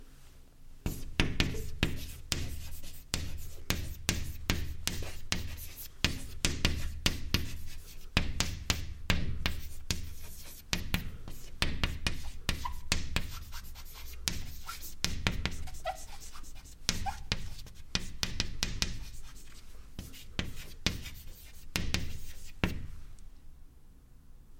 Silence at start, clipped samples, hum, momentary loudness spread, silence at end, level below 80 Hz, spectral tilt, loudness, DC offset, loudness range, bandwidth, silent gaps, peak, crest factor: 0 s; under 0.1%; none; 15 LU; 0 s; -40 dBFS; -3 dB/octave; -36 LUFS; under 0.1%; 5 LU; 16.5 kHz; none; -4 dBFS; 32 dB